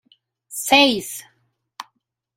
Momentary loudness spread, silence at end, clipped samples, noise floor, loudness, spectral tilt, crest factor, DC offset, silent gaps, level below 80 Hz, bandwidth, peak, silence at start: 25 LU; 0.55 s; under 0.1%; -70 dBFS; -16 LUFS; -1.5 dB/octave; 22 dB; under 0.1%; none; -62 dBFS; 16 kHz; 0 dBFS; 0.5 s